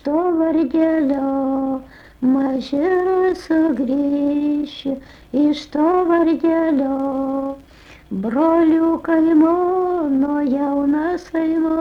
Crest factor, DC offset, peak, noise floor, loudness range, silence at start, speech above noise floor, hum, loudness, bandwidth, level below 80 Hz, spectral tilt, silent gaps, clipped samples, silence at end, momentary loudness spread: 12 dB; under 0.1%; -6 dBFS; -41 dBFS; 2 LU; 0.05 s; 24 dB; none; -18 LUFS; 6.8 kHz; -50 dBFS; -7 dB/octave; none; under 0.1%; 0 s; 10 LU